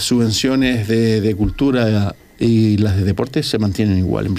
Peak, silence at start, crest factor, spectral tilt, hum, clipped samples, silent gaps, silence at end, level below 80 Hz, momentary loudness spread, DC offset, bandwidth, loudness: -2 dBFS; 0 s; 12 dB; -6 dB/octave; none; under 0.1%; none; 0 s; -36 dBFS; 4 LU; under 0.1%; 15.5 kHz; -16 LUFS